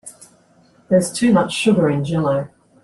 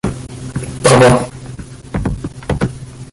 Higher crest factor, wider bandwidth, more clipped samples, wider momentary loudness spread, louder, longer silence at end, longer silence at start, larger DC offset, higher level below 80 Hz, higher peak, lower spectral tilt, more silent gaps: about the same, 16 dB vs 16 dB; about the same, 12.5 kHz vs 11.5 kHz; neither; second, 9 LU vs 22 LU; about the same, -17 LUFS vs -15 LUFS; first, 0.35 s vs 0.05 s; about the same, 0.05 s vs 0.05 s; neither; second, -54 dBFS vs -32 dBFS; second, -4 dBFS vs 0 dBFS; about the same, -6 dB/octave vs -5.5 dB/octave; neither